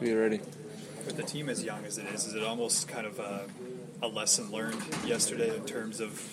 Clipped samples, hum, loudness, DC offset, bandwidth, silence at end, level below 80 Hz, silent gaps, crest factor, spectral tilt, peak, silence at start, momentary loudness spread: under 0.1%; none; -32 LUFS; under 0.1%; 16 kHz; 0 s; -76 dBFS; none; 22 dB; -2.5 dB/octave; -12 dBFS; 0 s; 13 LU